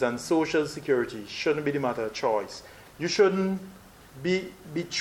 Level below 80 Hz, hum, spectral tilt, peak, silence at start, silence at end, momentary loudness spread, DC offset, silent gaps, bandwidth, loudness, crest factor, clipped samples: -60 dBFS; none; -5 dB/octave; -8 dBFS; 0 s; 0 s; 12 LU; under 0.1%; none; 16.5 kHz; -28 LUFS; 18 dB; under 0.1%